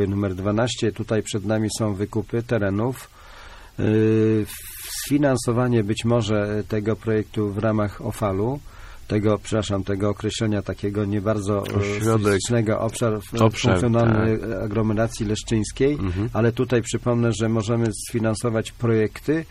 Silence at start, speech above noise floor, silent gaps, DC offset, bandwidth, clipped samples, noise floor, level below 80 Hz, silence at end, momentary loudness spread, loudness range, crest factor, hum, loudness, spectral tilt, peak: 0 s; 20 dB; none; under 0.1%; 15.5 kHz; under 0.1%; -42 dBFS; -42 dBFS; 0 s; 7 LU; 3 LU; 18 dB; none; -23 LUFS; -6 dB/octave; -4 dBFS